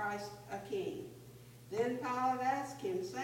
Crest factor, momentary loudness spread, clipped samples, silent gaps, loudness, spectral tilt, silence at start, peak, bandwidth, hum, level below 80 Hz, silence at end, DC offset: 16 dB; 18 LU; under 0.1%; none; -38 LUFS; -5 dB/octave; 0 s; -22 dBFS; 16.5 kHz; none; -72 dBFS; 0 s; under 0.1%